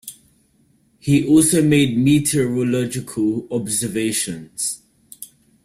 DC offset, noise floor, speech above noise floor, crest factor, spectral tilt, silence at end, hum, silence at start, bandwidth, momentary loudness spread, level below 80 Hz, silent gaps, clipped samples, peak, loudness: under 0.1%; -59 dBFS; 41 dB; 16 dB; -5 dB/octave; 0.4 s; none; 0.05 s; 16 kHz; 22 LU; -52 dBFS; none; under 0.1%; -4 dBFS; -18 LUFS